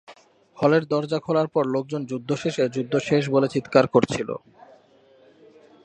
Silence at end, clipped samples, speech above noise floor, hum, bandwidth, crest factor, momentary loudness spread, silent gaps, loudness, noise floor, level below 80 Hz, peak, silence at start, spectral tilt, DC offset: 1.45 s; under 0.1%; 33 dB; none; 9.6 kHz; 22 dB; 9 LU; none; -23 LUFS; -55 dBFS; -62 dBFS; -2 dBFS; 0.1 s; -6.5 dB/octave; under 0.1%